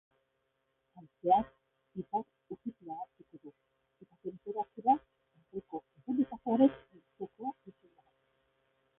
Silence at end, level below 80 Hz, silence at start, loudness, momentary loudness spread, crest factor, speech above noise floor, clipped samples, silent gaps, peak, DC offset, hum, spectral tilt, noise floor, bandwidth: 1.3 s; -72 dBFS; 0.95 s; -34 LUFS; 19 LU; 24 dB; 47 dB; under 0.1%; none; -14 dBFS; under 0.1%; none; -4.5 dB/octave; -80 dBFS; 3.8 kHz